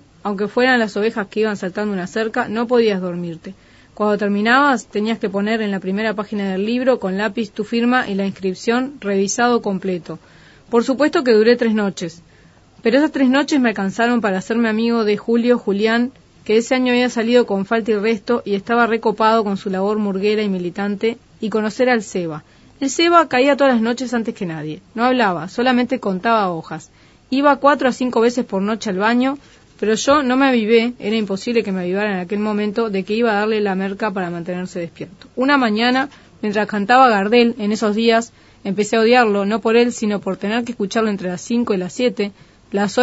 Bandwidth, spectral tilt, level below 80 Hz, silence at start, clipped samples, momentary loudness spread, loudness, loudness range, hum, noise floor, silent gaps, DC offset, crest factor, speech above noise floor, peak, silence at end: 8 kHz; -5 dB/octave; -56 dBFS; 0.25 s; under 0.1%; 11 LU; -18 LUFS; 3 LU; none; -48 dBFS; none; under 0.1%; 18 dB; 31 dB; 0 dBFS; 0 s